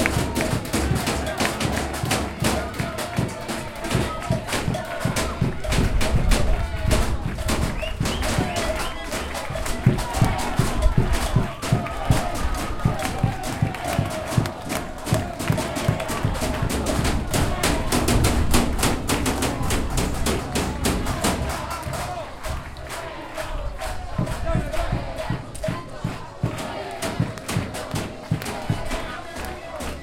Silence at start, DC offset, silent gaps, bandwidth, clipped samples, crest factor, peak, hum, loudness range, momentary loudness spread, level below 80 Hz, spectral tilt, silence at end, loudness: 0 s; under 0.1%; none; 17 kHz; under 0.1%; 20 dB; -2 dBFS; none; 6 LU; 8 LU; -30 dBFS; -5 dB/octave; 0 s; -25 LUFS